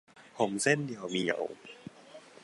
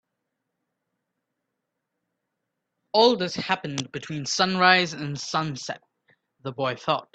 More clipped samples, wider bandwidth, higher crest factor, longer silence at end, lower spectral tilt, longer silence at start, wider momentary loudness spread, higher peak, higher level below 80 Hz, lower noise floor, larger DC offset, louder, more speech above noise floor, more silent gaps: neither; first, 11.5 kHz vs 9 kHz; about the same, 22 dB vs 26 dB; about the same, 0.15 s vs 0.1 s; about the same, -4 dB/octave vs -3.5 dB/octave; second, 0.15 s vs 2.95 s; first, 22 LU vs 16 LU; second, -12 dBFS vs -2 dBFS; second, -76 dBFS vs -68 dBFS; second, -53 dBFS vs -81 dBFS; neither; second, -31 LUFS vs -24 LUFS; second, 22 dB vs 57 dB; neither